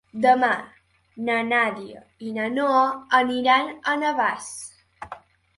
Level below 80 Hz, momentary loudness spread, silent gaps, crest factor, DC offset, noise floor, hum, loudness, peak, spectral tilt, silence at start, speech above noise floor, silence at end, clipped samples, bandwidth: -66 dBFS; 21 LU; none; 18 dB; under 0.1%; -44 dBFS; none; -22 LUFS; -4 dBFS; -3.5 dB/octave; 0.15 s; 22 dB; 0.4 s; under 0.1%; 11.5 kHz